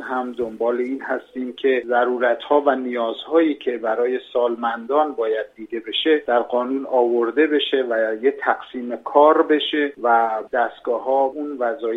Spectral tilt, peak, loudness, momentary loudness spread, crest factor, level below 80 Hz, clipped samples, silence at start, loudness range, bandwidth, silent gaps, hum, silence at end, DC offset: -5.5 dB/octave; -2 dBFS; -20 LUFS; 7 LU; 18 dB; -68 dBFS; under 0.1%; 0 s; 3 LU; 4.5 kHz; none; none; 0 s; under 0.1%